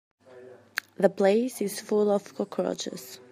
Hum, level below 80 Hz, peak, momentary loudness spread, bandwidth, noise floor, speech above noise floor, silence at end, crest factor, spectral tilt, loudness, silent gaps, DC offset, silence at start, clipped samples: none; -80 dBFS; -6 dBFS; 12 LU; 15.5 kHz; -50 dBFS; 23 dB; 0.15 s; 20 dB; -5 dB/octave; -27 LUFS; none; under 0.1%; 0.35 s; under 0.1%